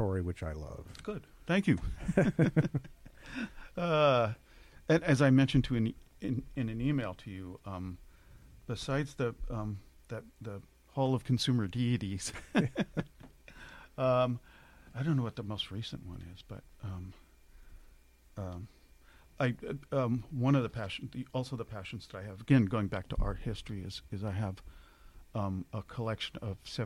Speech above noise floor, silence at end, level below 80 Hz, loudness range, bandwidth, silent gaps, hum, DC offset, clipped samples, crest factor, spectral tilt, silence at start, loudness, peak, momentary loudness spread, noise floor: 27 dB; 0 s; -50 dBFS; 10 LU; 13 kHz; none; none; under 0.1%; under 0.1%; 22 dB; -6.5 dB/octave; 0 s; -34 LUFS; -12 dBFS; 18 LU; -60 dBFS